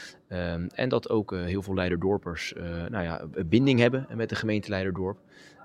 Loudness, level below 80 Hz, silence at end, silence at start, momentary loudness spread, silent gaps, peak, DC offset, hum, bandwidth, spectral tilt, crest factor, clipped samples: -28 LUFS; -56 dBFS; 0 s; 0 s; 11 LU; none; -6 dBFS; under 0.1%; none; 13 kHz; -7 dB/octave; 22 dB; under 0.1%